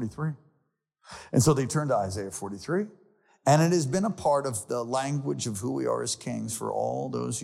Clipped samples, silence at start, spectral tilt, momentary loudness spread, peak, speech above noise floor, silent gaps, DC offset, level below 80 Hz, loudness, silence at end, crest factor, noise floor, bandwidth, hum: under 0.1%; 0 s; -5.5 dB/octave; 11 LU; -10 dBFS; 47 dB; none; under 0.1%; -60 dBFS; -28 LUFS; 0 s; 18 dB; -75 dBFS; 15.5 kHz; none